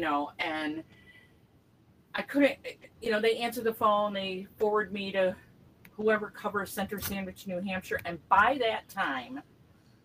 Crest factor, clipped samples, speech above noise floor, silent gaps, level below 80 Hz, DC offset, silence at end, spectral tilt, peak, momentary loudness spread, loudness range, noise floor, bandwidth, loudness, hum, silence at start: 22 dB; under 0.1%; 32 dB; none; -64 dBFS; under 0.1%; 0.65 s; -4.5 dB/octave; -8 dBFS; 12 LU; 3 LU; -63 dBFS; 16 kHz; -30 LUFS; none; 0 s